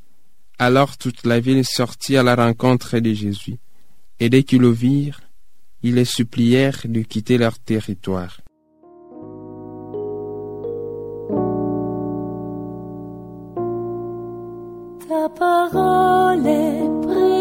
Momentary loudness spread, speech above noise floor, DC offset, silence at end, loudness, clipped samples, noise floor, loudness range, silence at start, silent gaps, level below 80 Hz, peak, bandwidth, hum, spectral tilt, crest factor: 18 LU; 46 dB; 0.7%; 0 s; -19 LUFS; under 0.1%; -63 dBFS; 10 LU; 0 s; none; -50 dBFS; 0 dBFS; 16.5 kHz; none; -6.5 dB/octave; 18 dB